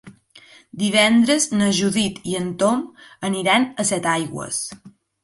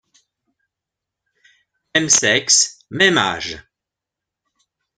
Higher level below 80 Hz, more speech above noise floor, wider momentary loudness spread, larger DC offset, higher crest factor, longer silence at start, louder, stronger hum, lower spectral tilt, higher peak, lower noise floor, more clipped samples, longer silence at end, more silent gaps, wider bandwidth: about the same, -58 dBFS vs -58 dBFS; second, 29 dB vs 68 dB; second, 11 LU vs 14 LU; neither; second, 16 dB vs 22 dB; second, 0.05 s vs 1.95 s; second, -19 LUFS vs -15 LUFS; neither; first, -3.5 dB/octave vs -1 dB/octave; second, -4 dBFS vs 0 dBFS; second, -49 dBFS vs -85 dBFS; neither; second, 0.35 s vs 1.4 s; neither; about the same, 11.5 kHz vs 11 kHz